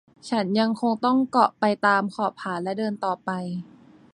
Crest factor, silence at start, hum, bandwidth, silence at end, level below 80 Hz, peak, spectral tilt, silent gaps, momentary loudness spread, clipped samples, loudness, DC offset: 20 dB; 0.25 s; none; 10.5 kHz; 0.5 s; -70 dBFS; -4 dBFS; -6 dB/octave; none; 9 LU; under 0.1%; -24 LUFS; under 0.1%